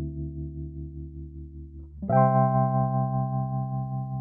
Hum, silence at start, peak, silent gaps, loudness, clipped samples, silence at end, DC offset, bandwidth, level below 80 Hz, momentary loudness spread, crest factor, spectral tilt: none; 0 s; -10 dBFS; none; -26 LUFS; under 0.1%; 0 s; under 0.1%; 2.5 kHz; -44 dBFS; 21 LU; 18 dB; -14 dB/octave